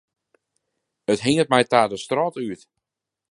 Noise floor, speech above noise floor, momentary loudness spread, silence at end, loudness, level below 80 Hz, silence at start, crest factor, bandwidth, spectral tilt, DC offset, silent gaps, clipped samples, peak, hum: -86 dBFS; 66 dB; 15 LU; 0.75 s; -21 LUFS; -62 dBFS; 1.1 s; 22 dB; 11.5 kHz; -4.5 dB/octave; under 0.1%; none; under 0.1%; 0 dBFS; none